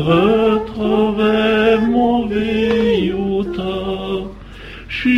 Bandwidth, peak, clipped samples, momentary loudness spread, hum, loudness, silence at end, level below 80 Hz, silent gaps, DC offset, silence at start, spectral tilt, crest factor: 7.8 kHz; -2 dBFS; under 0.1%; 12 LU; none; -16 LUFS; 0 s; -38 dBFS; none; under 0.1%; 0 s; -7.5 dB/octave; 14 dB